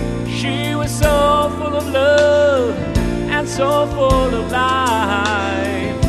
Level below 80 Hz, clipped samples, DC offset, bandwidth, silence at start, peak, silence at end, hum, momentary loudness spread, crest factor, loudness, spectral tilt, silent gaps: -28 dBFS; under 0.1%; under 0.1%; 13 kHz; 0 s; 0 dBFS; 0 s; none; 7 LU; 16 dB; -16 LUFS; -5 dB/octave; none